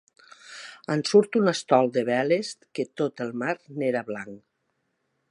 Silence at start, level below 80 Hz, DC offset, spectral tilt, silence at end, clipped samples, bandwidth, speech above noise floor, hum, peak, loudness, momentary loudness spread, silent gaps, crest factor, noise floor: 0.45 s; -78 dBFS; under 0.1%; -5 dB/octave; 0.9 s; under 0.1%; 11 kHz; 51 dB; none; -4 dBFS; -25 LUFS; 19 LU; none; 22 dB; -75 dBFS